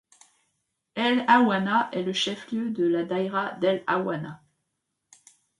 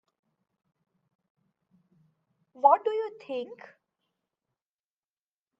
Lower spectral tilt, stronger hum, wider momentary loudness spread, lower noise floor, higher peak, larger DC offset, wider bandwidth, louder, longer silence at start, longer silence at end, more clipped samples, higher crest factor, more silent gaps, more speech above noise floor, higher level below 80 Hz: about the same, -5 dB/octave vs -5.5 dB/octave; neither; second, 11 LU vs 14 LU; second, -80 dBFS vs under -90 dBFS; about the same, -6 dBFS vs -6 dBFS; neither; first, 11.5 kHz vs 7 kHz; about the same, -25 LUFS vs -27 LUFS; second, 0.95 s vs 2.65 s; second, 1.25 s vs 2.05 s; neither; about the same, 22 dB vs 26 dB; neither; second, 55 dB vs over 63 dB; first, -74 dBFS vs under -90 dBFS